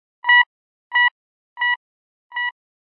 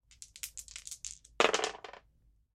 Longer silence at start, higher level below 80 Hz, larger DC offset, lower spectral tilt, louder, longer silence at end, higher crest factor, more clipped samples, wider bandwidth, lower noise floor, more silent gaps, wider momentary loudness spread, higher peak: about the same, 0.25 s vs 0.2 s; second, under -90 dBFS vs -66 dBFS; neither; second, 3.5 dB/octave vs -0.5 dB/octave; first, -18 LUFS vs -35 LUFS; about the same, 0.45 s vs 0.55 s; second, 18 dB vs 30 dB; neither; second, 5.2 kHz vs 16 kHz; first, under -90 dBFS vs -68 dBFS; first, 0.46-0.90 s, 1.11-1.56 s, 1.76-2.30 s vs none; second, 12 LU vs 21 LU; about the same, -4 dBFS vs -6 dBFS